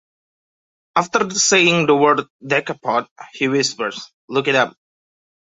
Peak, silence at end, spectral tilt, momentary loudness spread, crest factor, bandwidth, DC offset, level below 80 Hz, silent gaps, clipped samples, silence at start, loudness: -2 dBFS; 0.85 s; -3 dB/octave; 11 LU; 18 dB; 8 kHz; under 0.1%; -64 dBFS; 2.30-2.39 s, 3.11-3.16 s, 4.14-4.28 s; under 0.1%; 0.95 s; -17 LUFS